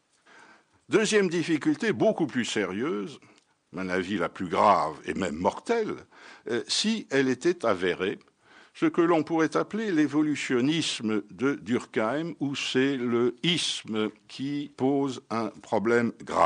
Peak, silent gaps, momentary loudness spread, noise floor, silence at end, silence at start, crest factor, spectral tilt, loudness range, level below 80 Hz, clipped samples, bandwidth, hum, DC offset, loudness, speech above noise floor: -10 dBFS; none; 9 LU; -57 dBFS; 0 s; 0.9 s; 18 dB; -4.5 dB/octave; 2 LU; -68 dBFS; under 0.1%; 10 kHz; none; under 0.1%; -27 LUFS; 30 dB